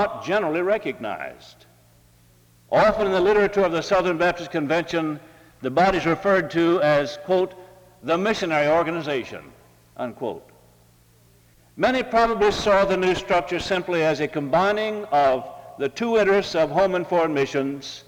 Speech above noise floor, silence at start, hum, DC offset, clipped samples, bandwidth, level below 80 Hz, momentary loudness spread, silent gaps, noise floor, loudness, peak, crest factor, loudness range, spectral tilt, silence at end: 34 dB; 0 s; none; under 0.1%; under 0.1%; 19 kHz; -50 dBFS; 11 LU; none; -56 dBFS; -22 LUFS; -8 dBFS; 16 dB; 4 LU; -5.5 dB/octave; 0.05 s